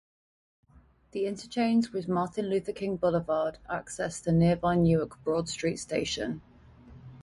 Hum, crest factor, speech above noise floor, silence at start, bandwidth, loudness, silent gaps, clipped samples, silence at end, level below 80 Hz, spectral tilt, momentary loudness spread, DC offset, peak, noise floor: none; 16 dB; 32 dB; 1.15 s; 11.5 kHz; -29 LUFS; none; under 0.1%; 0 s; -54 dBFS; -6 dB/octave; 10 LU; under 0.1%; -14 dBFS; -60 dBFS